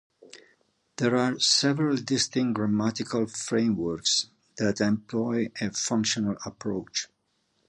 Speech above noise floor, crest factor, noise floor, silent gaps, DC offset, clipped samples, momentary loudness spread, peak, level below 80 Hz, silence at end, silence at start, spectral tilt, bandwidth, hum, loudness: 46 dB; 18 dB; -73 dBFS; none; under 0.1%; under 0.1%; 10 LU; -10 dBFS; -62 dBFS; 0.65 s; 0.35 s; -3.5 dB/octave; 11 kHz; none; -26 LUFS